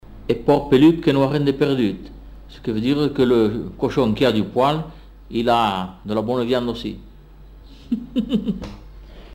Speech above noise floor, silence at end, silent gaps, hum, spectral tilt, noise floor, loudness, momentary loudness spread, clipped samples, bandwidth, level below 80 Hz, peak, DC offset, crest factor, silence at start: 24 dB; 0 s; none; none; -7.5 dB/octave; -43 dBFS; -20 LUFS; 14 LU; under 0.1%; 16 kHz; -42 dBFS; -4 dBFS; under 0.1%; 16 dB; 0.1 s